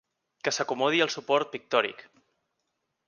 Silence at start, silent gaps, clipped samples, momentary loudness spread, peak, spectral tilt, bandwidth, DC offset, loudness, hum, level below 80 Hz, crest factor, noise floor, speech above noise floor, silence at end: 0.45 s; none; under 0.1%; 7 LU; -8 dBFS; -2.5 dB/octave; 10 kHz; under 0.1%; -27 LUFS; none; -80 dBFS; 22 dB; -80 dBFS; 53 dB; 1.05 s